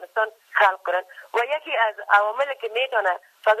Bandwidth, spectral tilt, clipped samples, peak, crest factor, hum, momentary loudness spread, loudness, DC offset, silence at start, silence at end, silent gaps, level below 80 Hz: 14 kHz; -0.5 dB/octave; under 0.1%; -4 dBFS; 20 dB; none; 7 LU; -22 LUFS; under 0.1%; 0 s; 0 s; none; -78 dBFS